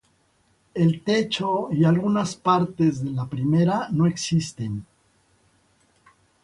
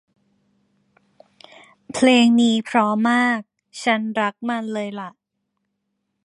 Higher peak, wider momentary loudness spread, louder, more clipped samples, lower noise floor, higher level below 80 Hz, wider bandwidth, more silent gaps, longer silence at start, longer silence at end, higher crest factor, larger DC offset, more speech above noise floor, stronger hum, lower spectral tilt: second, -8 dBFS vs -2 dBFS; second, 9 LU vs 17 LU; second, -23 LUFS vs -19 LUFS; neither; second, -64 dBFS vs -76 dBFS; first, -58 dBFS vs -70 dBFS; about the same, 11.5 kHz vs 11 kHz; neither; second, 0.75 s vs 1.9 s; first, 1.6 s vs 1.15 s; about the same, 16 dB vs 20 dB; neither; second, 42 dB vs 58 dB; neither; first, -6.5 dB/octave vs -4 dB/octave